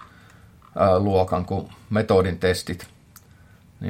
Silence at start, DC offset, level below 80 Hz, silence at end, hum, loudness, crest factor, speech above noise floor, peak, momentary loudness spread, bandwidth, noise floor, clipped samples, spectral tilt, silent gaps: 0 s; under 0.1%; -54 dBFS; 0 s; none; -22 LUFS; 20 dB; 30 dB; -4 dBFS; 15 LU; 16.5 kHz; -51 dBFS; under 0.1%; -6.5 dB/octave; none